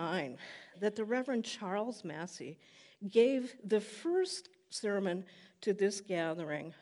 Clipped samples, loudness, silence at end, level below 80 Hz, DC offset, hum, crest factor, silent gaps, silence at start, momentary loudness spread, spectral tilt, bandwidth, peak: under 0.1%; -36 LUFS; 0.05 s; -90 dBFS; under 0.1%; none; 20 dB; none; 0 s; 15 LU; -4.5 dB/octave; 11.5 kHz; -16 dBFS